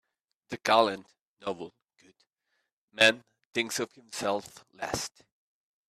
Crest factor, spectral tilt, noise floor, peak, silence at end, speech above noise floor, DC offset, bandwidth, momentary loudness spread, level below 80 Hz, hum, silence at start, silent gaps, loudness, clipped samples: 24 dB; -2.5 dB/octave; -80 dBFS; -8 dBFS; 0.8 s; 50 dB; under 0.1%; 14.5 kHz; 19 LU; -68 dBFS; none; 0.5 s; 1.21-1.37 s, 2.73-2.88 s, 3.45-3.51 s; -29 LUFS; under 0.1%